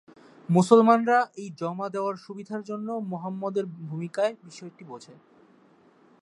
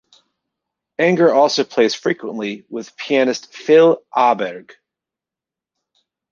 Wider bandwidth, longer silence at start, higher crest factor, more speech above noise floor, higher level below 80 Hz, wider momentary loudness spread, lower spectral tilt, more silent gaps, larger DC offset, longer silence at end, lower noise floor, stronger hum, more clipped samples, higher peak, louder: first, 11.5 kHz vs 7.4 kHz; second, 0.5 s vs 1 s; first, 24 dB vs 16 dB; second, 33 dB vs 71 dB; second, -78 dBFS vs -68 dBFS; first, 25 LU vs 16 LU; first, -7 dB/octave vs -4.5 dB/octave; neither; neither; second, 1.1 s vs 1.7 s; second, -58 dBFS vs -88 dBFS; neither; neither; about the same, -2 dBFS vs -2 dBFS; second, -25 LUFS vs -16 LUFS